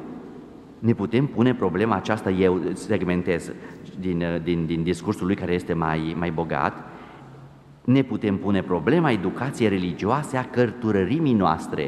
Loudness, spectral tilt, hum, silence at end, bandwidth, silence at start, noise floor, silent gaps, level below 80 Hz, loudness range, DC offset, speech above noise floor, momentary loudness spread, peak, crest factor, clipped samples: -23 LUFS; -7.5 dB/octave; none; 0 s; 12.5 kHz; 0 s; -46 dBFS; none; -52 dBFS; 3 LU; under 0.1%; 23 dB; 16 LU; -4 dBFS; 18 dB; under 0.1%